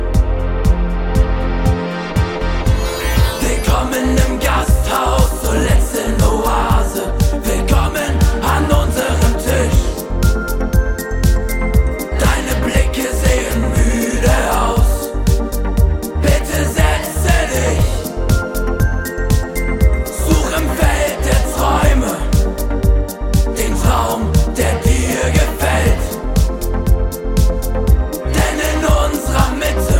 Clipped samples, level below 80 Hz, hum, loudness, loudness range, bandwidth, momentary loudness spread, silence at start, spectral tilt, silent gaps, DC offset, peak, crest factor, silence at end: under 0.1%; -16 dBFS; none; -16 LUFS; 1 LU; 17 kHz; 4 LU; 0 s; -5.5 dB/octave; none; under 0.1%; 0 dBFS; 14 dB; 0 s